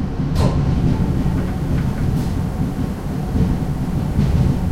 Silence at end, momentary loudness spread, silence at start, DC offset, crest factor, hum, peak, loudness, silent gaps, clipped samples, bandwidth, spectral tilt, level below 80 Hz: 0 s; 5 LU; 0 s; under 0.1%; 14 dB; none; -4 dBFS; -20 LUFS; none; under 0.1%; 15.5 kHz; -8 dB/octave; -24 dBFS